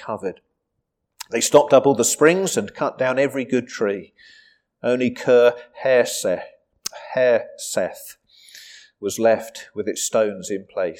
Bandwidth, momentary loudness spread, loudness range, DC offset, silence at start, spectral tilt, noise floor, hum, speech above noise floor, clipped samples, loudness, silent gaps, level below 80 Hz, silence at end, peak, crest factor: 18 kHz; 16 LU; 6 LU; under 0.1%; 0 s; -3.5 dB/octave; -77 dBFS; none; 57 dB; under 0.1%; -20 LUFS; none; -68 dBFS; 0.05 s; -2 dBFS; 20 dB